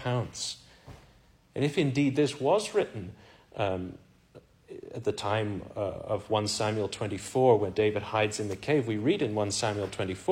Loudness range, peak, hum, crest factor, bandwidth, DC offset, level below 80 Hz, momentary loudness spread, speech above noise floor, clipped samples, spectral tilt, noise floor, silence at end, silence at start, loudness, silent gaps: 6 LU; -12 dBFS; none; 18 dB; 15.5 kHz; under 0.1%; -60 dBFS; 12 LU; 31 dB; under 0.1%; -5 dB/octave; -60 dBFS; 0 s; 0 s; -29 LUFS; none